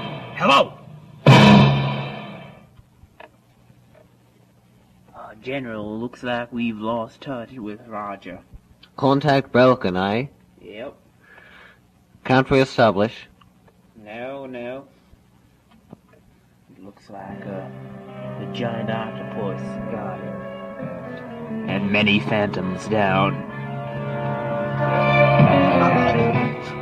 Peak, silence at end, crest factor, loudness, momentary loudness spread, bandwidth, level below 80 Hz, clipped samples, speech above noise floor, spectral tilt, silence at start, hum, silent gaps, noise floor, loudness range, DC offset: 0 dBFS; 0 s; 22 dB; -20 LUFS; 21 LU; 9.8 kHz; -50 dBFS; under 0.1%; 34 dB; -7 dB/octave; 0 s; none; none; -55 dBFS; 20 LU; under 0.1%